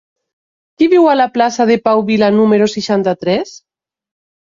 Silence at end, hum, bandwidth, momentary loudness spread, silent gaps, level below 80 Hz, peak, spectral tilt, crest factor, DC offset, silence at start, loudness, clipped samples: 0.95 s; none; 7.6 kHz; 7 LU; none; -56 dBFS; -2 dBFS; -5.5 dB/octave; 12 dB; under 0.1%; 0.8 s; -12 LUFS; under 0.1%